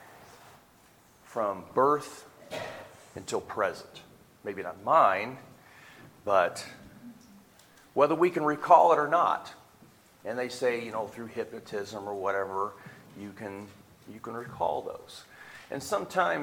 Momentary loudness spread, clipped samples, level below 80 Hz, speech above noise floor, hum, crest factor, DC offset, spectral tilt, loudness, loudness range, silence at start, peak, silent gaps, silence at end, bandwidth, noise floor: 24 LU; under 0.1%; -70 dBFS; 31 dB; none; 26 dB; under 0.1%; -5 dB/octave; -28 LUFS; 10 LU; 0.2 s; -6 dBFS; none; 0 s; 18 kHz; -59 dBFS